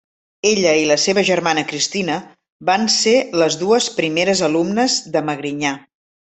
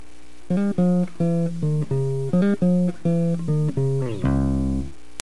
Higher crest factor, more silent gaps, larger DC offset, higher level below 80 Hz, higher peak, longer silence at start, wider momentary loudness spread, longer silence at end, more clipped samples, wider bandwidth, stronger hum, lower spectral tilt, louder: second, 16 dB vs 22 dB; first, 2.52-2.60 s vs none; second, under 0.1% vs 3%; second, -60 dBFS vs -36 dBFS; about the same, -2 dBFS vs 0 dBFS; about the same, 0.45 s vs 0.5 s; first, 8 LU vs 4 LU; first, 0.55 s vs 0.35 s; neither; second, 8.6 kHz vs 11.5 kHz; neither; second, -3 dB/octave vs -8.5 dB/octave; first, -17 LUFS vs -22 LUFS